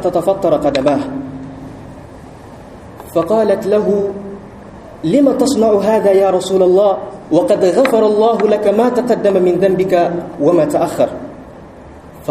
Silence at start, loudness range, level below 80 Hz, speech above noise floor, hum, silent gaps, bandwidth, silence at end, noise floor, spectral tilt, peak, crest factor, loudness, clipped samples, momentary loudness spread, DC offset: 0 s; 6 LU; -46 dBFS; 23 dB; none; none; 15 kHz; 0 s; -35 dBFS; -6.5 dB/octave; 0 dBFS; 14 dB; -13 LUFS; under 0.1%; 19 LU; under 0.1%